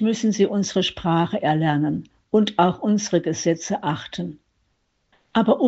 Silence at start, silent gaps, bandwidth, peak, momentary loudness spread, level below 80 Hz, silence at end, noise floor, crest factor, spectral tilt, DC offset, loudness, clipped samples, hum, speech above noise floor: 0 s; none; 8 kHz; -4 dBFS; 8 LU; -56 dBFS; 0 s; -69 dBFS; 18 dB; -5.5 dB/octave; under 0.1%; -22 LUFS; under 0.1%; none; 49 dB